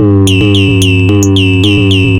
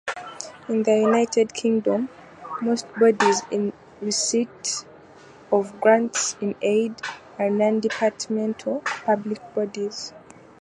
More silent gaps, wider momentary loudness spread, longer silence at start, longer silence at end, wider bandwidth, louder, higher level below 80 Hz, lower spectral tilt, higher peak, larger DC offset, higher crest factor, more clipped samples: neither; second, 1 LU vs 14 LU; about the same, 0 s vs 0.05 s; second, 0 s vs 0.4 s; first, 14.5 kHz vs 11.5 kHz; first, -7 LUFS vs -23 LUFS; first, -30 dBFS vs -68 dBFS; first, -5.5 dB/octave vs -3.5 dB/octave; first, 0 dBFS vs -4 dBFS; neither; second, 6 dB vs 20 dB; first, 0.8% vs under 0.1%